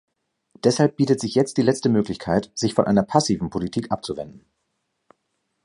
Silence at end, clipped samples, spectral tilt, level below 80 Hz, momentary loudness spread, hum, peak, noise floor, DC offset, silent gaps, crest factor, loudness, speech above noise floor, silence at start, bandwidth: 1.25 s; under 0.1%; -5.5 dB/octave; -52 dBFS; 9 LU; none; -2 dBFS; -74 dBFS; under 0.1%; none; 22 dB; -22 LUFS; 53 dB; 0.65 s; 11.5 kHz